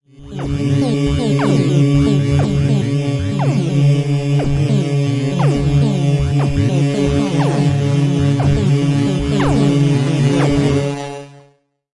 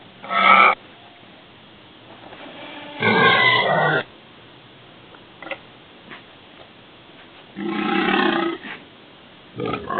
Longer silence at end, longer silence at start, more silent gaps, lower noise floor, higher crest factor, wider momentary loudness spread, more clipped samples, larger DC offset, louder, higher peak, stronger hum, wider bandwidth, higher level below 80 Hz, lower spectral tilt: first, 0.7 s vs 0 s; about the same, 0.2 s vs 0.25 s; neither; first, -53 dBFS vs -46 dBFS; second, 12 dB vs 22 dB; second, 4 LU vs 27 LU; neither; neither; about the same, -15 LUFS vs -17 LUFS; about the same, -2 dBFS vs 0 dBFS; neither; first, 11 kHz vs 4.7 kHz; first, -32 dBFS vs -62 dBFS; second, -7.5 dB/octave vs -9 dB/octave